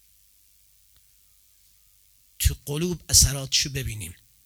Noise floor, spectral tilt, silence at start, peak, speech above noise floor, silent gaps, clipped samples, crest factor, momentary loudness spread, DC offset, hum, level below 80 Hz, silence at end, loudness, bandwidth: -59 dBFS; -2.5 dB/octave; 2.4 s; -2 dBFS; 35 dB; none; under 0.1%; 26 dB; 17 LU; under 0.1%; none; -36 dBFS; 0.3 s; -22 LUFS; over 20 kHz